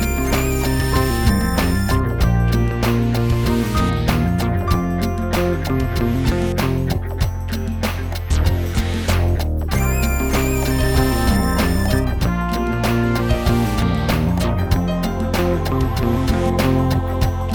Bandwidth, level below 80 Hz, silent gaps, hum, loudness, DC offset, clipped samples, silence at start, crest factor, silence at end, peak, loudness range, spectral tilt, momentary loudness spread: over 20 kHz; -22 dBFS; none; none; -19 LUFS; under 0.1%; under 0.1%; 0 s; 16 dB; 0 s; 0 dBFS; 3 LU; -6 dB/octave; 4 LU